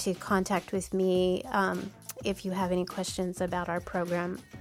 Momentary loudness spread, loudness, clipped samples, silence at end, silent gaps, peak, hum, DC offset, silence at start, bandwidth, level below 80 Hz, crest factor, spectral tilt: 7 LU; -31 LUFS; under 0.1%; 0 s; none; -14 dBFS; none; under 0.1%; 0 s; 18.5 kHz; -56 dBFS; 18 dB; -5 dB/octave